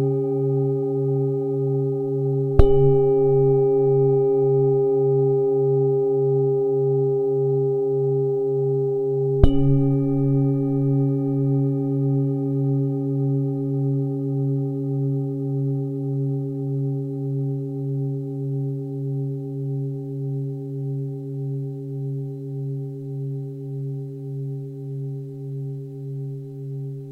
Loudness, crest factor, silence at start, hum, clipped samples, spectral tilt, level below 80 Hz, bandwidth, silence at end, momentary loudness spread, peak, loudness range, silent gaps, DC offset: -23 LUFS; 22 dB; 0 s; none; under 0.1%; -12 dB/octave; -34 dBFS; 3.2 kHz; 0 s; 13 LU; 0 dBFS; 12 LU; none; under 0.1%